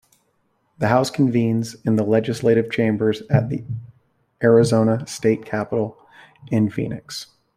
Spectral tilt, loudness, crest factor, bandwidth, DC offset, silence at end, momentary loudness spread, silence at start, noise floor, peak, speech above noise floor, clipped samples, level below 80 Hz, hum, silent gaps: -7 dB/octave; -20 LUFS; 18 dB; 14.5 kHz; under 0.1%; 0.35 s; 12 LU; 0.8 s; -67 dBFS; -2 dBFS; 47 dB; under 0.1%; -56 dBFS; none; none